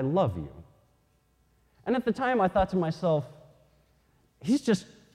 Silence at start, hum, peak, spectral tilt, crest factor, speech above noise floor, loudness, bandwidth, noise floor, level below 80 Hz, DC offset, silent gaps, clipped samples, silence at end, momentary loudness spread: 0 s; none; -12 dBFS; -7 dB/octave; 16 dB; 41 dB; -28 LUFS; 13 kHz; -68 dBFS; -52 dBFS; under 0.1%; none; under 0.1%; 0.3 s; 15 LU